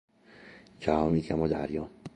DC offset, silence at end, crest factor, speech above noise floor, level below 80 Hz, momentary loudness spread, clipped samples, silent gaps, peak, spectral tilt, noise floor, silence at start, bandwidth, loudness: under 0.1%; 0.05 s; 22 dB; 25 dB; -50 dBFS; 10 LU; under 0.1%; none; -10 dBFS; -8 dB/octave; -53 dBFS; 0.4 s; 9.8 kHz; -30 LUFS